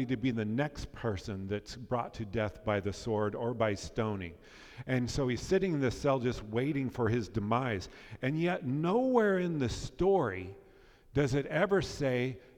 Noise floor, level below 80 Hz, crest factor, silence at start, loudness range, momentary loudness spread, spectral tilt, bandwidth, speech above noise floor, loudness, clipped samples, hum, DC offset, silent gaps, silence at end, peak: -59 dBFS; -52 dBFS; 18 dB; 0 s; 4 LU; 9 LU; -6.5 dB/octave; 14 kHz; 27 dB; -33 LUFS; under 0.1%; none; under 0.1%; none; 0.2 s; -14 dBFS